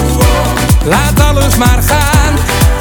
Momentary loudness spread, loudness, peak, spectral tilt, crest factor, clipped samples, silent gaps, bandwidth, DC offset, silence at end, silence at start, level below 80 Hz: 2 LU; -9 LUFS; 0 dBFS; -4.5 dB/octave; 8 dB; 0.2%; none; over 20 kHz; under 0.1%; 0 s; 0 s; -12 dBFS